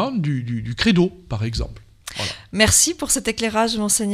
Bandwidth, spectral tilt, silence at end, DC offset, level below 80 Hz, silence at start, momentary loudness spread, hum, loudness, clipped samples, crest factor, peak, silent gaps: 16 kHz; -3.5 dB/octave; 0 s; under 0.1%; -38 dBFS; 0 s; 13 LU; none; -19 LUFS; under 0.1%; 18 dB; -2 dBFS; none